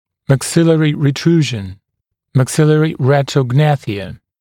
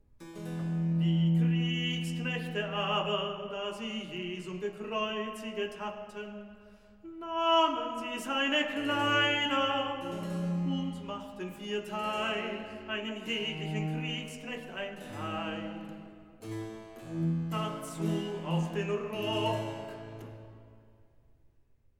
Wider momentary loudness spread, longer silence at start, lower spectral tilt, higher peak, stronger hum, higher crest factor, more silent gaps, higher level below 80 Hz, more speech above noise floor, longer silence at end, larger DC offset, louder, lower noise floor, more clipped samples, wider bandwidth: second, 12 LU vs 17 LU; about the same, 0.3 s vs 0.2 s; about the same, -6.5 dB/octave vs -5.5 dB/octave; first, 0 dBFS vs -14 dBFS; neither; about the same, 14 dB vs 18 dB; neither; first, -52 dBFS vs -66 dBFS; first, 62 dB vs 33 dB; second, 0.25 s vs 1.2 s; neither; first, -14 LUFS vs -32 LUFS; first, -75 dBFS vs -66 dBFS; neither; about the same, 14 kHz vs 13.5 kHz